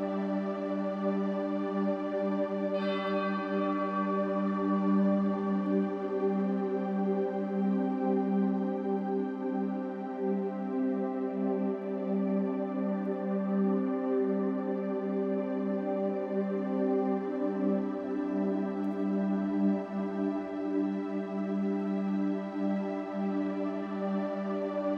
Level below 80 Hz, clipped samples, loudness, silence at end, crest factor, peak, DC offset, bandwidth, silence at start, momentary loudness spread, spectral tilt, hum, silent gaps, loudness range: -76 dBFS; under 0.1%; -31 LUFS; 0 s; 12 dB; -18 dBFS; under 0.1%; 5.6 kHz; 0 s; 4 LU; -9.5 dB/octave; none; none; 3 LU